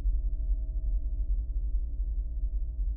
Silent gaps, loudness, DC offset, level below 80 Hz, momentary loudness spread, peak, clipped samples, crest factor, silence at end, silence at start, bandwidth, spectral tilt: none; -35 LUFS; under 0.1%; -30 dBFS; 2 LU; -18 dBFS; under 0.1%; 10 dB; 0 s; 0 s; 0.7 kHz; -17 dB/octave